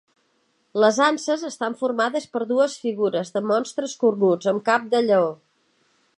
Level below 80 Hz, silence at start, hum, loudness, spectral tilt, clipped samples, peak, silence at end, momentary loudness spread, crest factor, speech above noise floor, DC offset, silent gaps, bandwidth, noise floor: -78 dBFS; 0.75 s; none; -22 LUFS; -4.5 dB/octave; under 0.1%; -4 dBFS; 0.85 s; 7 LU; 20 dB; 46 dB; under 0.1%; none; 11 kHz; -67 dBFS